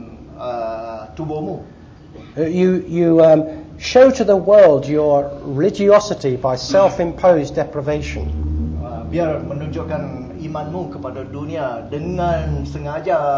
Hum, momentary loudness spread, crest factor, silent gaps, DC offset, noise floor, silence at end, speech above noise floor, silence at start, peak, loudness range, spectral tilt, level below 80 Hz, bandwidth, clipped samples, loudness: none; 16 LU; 16 dB; none; under 0.1%; -39 dBFS; 0 s; 23 dB; 0 s; -2 dBFS; 11 LU; -7 dB/octave; -34 dBFS; 7.6 kHz; under 0.1%; -17 LUFS